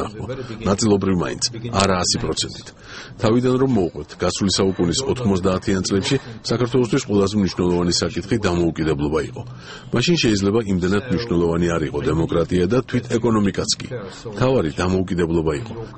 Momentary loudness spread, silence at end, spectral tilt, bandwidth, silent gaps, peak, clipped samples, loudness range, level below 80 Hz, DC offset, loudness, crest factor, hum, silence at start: 9 LU; 0 s; -5 dB/octave; 8.8 kHz; none; 0 dBFS; under 0.1%; 1 LU; -40 dBFS; under 0.1%; -20 LUFS; 20 dB; none; 0 s